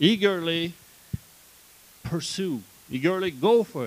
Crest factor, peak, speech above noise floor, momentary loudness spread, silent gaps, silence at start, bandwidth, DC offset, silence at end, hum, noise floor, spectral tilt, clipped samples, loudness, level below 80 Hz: 20 dB; -6 dBFS; 29 dB; 17 LU; none; 0 s; 15.5 kHz; under 0.1%; 0 s; none; -53 dBFS; -5 dB/octave; under 0.1%; -26 LUFS; -56 dBFS